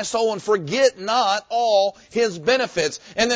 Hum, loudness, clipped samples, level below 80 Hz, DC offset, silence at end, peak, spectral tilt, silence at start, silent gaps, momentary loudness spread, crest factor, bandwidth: none; -21 LUFS; under 0.1%; -58 dBFS; under 0.1%; 0 s; -4 dBFS; -3 dB/octave; 0 s; none; 5 LU; 16 dB; 8 kHz